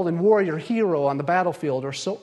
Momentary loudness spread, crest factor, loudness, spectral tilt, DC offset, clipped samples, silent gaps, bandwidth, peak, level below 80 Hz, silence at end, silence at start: 7 LU; 16 dB; -22 LUFS; -6 dB/octave; under 0.1%; under 0.1%; none; 11.5 kHz; -6 dBFS; -70 dBFS; 0.05 s; 0 s